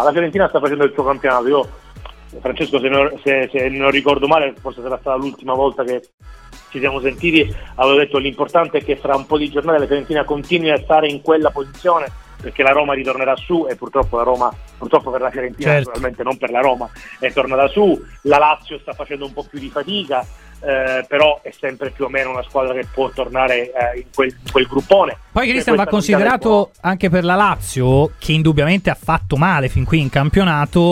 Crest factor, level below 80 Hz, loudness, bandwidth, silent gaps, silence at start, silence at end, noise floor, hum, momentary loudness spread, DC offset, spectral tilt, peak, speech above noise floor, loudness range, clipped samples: 16 dB; -36 dBFS; -16 LUFS; 15.5 kHz; 6.14-6.18 s; 0 s; 0 s; -36 dBFS; none; 10 LU; under 0.1%; -6 dB/octave; 0 dBFS; 20 dB; 4 LU; under 0.1%